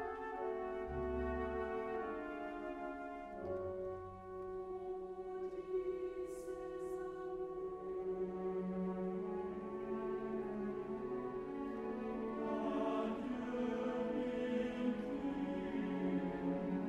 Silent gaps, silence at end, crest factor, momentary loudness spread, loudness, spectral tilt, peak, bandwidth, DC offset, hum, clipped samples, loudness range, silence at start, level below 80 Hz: none; 0 s; 16 dB; 7 LU; -42 LUFS; -8 dB/octave; -26 dBFS; 11.5 kHz; under 0.1%; none; under 0.1%; 5 LU; 0 s; -60 dBFS